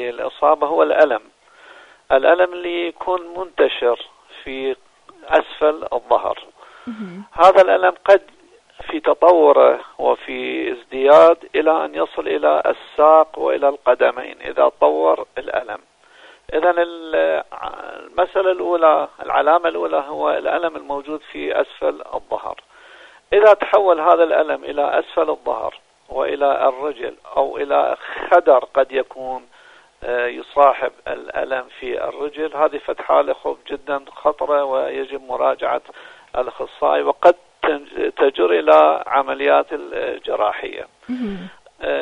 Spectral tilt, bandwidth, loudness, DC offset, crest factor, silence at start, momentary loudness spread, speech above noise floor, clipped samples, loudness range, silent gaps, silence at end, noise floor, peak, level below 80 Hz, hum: -5 dB/octave; 8.2 kHz; -17 LUFS; under 0.1%; 18 dB; 0 s; 16 LU; 31 dB; under 0.1%; 7 LU; none; 0 s; -48 dBFS; 0 dBFS; -54 dBFS; none